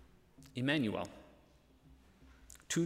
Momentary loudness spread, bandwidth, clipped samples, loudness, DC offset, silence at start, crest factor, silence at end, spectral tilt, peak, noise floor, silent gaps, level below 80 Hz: 24 LU; 16 kHz; under 0.1%; -37 LUFS; under 0.1%; 0.4 s; 22 dB; 0 s; -4.5 dB/octave; -18 dBFS; -65 dBFS; none; -66 dBFS